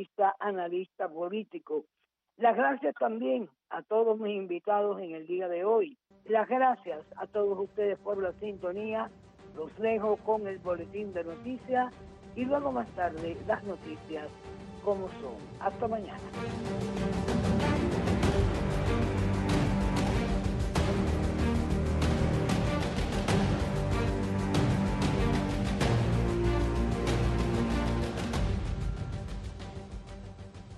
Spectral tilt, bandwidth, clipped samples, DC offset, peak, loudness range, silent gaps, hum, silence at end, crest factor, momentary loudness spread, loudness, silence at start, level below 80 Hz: -7 dB/octave; 12.5 kHz; under 0.1%; under 0.1%; -14 dBFS; 5 LU; none; none; 0 s; 18 dB; 12 LU; -31 LUFS; 0 s; -38 dBFS